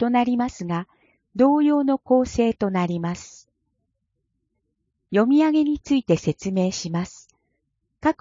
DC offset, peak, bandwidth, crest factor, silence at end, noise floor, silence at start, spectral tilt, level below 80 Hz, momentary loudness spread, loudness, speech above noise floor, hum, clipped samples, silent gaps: under 0.1%; -6 dBFS; 7.6 kHz; 18 dB; 0.1 s; -75 dBFS; 0 s; -6.5 dB/octave; -52 dBFS; 12 LU; -22 LUFS; 55 dB; none; under 0.1%; none